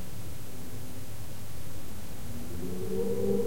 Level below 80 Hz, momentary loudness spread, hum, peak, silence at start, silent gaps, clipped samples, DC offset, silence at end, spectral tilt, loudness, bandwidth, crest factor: -50 dBFS; 12 LU; none; -16 dBFS; 0 s; none; under 0.1%; 3%; 0 s; -6 dB/octave; -38 LUFS; 16.5 kHz; 18 dB